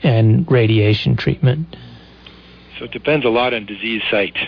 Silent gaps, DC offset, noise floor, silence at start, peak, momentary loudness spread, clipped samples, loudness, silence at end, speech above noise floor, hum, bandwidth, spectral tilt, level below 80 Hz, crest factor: none; under 0.1%; -42 dBFS; 0 s; -4 dBFS; 14 LU; under 0.1%; -16 LUFS; 0 s; 26 dB; none; 5.4 kHz; -9 dB/octave; -44 dBFS; 14 dB